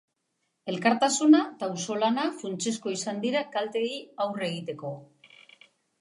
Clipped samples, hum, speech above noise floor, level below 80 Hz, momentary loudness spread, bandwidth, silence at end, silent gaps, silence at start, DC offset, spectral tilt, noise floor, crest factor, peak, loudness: under 0.1%; none; 51 dB; -82 dBFS; 15 LU; 11.5 kHz; 0.95 s; none; 0.65 s; under 0.1%; -4 dB/octave; -78 dBFS; 20 dB; -8 dBFS; -27 LUFS